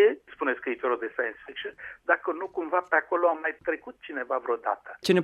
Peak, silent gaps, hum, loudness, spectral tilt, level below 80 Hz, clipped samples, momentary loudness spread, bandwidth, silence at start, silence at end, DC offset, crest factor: -6 dBFS; none; none; -29 LUFS; -5.5 dB/octave; -70 dBFS; under 0.1%; 12 LU; 13 kHz; 0 s; 0 s; under 0.1%; 20 dB